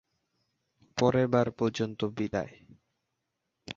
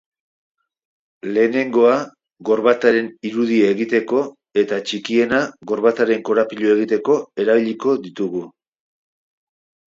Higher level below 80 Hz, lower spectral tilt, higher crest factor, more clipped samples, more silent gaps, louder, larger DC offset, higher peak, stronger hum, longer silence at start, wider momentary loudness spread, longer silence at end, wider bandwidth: about the same, -62 dBFS vs -66 dBFS; about the same, -6.5 dB/octave vs -5.5 dB/octave; about the same, 22 dB vs 18 dB; neither; neither; second, -29 LUFS vs -18 LUFS; neither; second, -10 dBFS vs 0 dBFS; neither; second, 0.95 s vs 1.25 s; about the same, 11 LU vs 9 LU; second, 0.05 s vs 1.45 s; about the same, 7.8 kHz vs 7.8 kHz